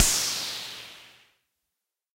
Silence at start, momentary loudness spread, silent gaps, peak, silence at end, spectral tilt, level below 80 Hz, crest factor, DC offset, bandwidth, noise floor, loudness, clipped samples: 0 s; 22 LU; none; -4 dBFS; 1.1 s; 0.5 dB/octave; -46 dBFS; 28 dB; under 0.1%; 16 kHz; -85 dBFS; -27 LUFS; under 0.1%